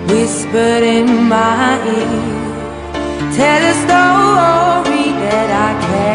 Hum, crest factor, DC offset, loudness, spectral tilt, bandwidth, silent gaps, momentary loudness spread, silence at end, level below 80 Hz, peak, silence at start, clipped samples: none; 12 dB; under 0.1%; -12 LUFS; -4.5 dB/octave; 11 kHz; none; 10 LU; 0 s; -40 dBFS; 0 dBFS; 0 s; under 0.1%